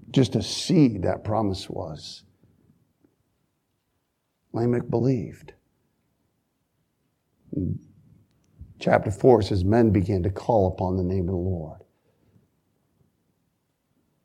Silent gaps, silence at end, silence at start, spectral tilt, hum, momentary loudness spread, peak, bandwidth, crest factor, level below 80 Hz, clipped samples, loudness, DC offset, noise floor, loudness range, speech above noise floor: none; 2.5 s; 0.1 s; -7 dB/octave; none; 16 LU; -4 dBFS; 12 kHz; 24 dB; -50 dBFS; under 0.1%; -24 LUFS; under 0.1%; -75 dBFS; 13 LU; 52 dB